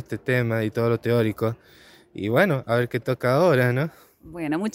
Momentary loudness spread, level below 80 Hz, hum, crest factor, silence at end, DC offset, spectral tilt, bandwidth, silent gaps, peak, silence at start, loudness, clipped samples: 13 LU; -58 dBFS; none; 18 dB; 0.05 s; under 0.1%; -7.5 dB/octave; 16 kHz; none; -4 dBFS; 0 s; -23 LUFS; under 0.1%